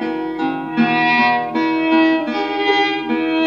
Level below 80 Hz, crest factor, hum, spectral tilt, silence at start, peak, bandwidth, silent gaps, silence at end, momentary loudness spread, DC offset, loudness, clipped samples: -56 dBFS; 14 dB; 50 Hz at -50 dBFS; -5.5 dB/octave; 0 s; -4 dBFS; 6.8 kHz; none; 0 s; 8 LU; under 0.1%; -17 LUFS; under 0.1%